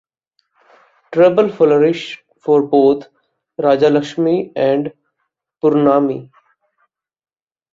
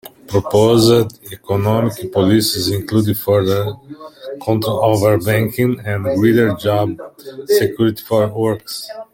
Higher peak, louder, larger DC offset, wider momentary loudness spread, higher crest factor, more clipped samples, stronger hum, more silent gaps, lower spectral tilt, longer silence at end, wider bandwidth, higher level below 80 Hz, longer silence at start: about the same, -2 dBFS vs -2 dBFS; about the same, -15 LUFS vs -16 LUFS; neither; about the same, 13 LU vs 14 LU; about the same, 16 dB vs 14 dB; neither; neither; neither; first, -7.5 dB/octave vs -6 dB/octave; first, 1.5 s vs 0.1 s; second, 7.6 kHz vs 17 kHz; second, -62 dBFS vs -50 dBFS; first, 1.1 s vs 0.05 s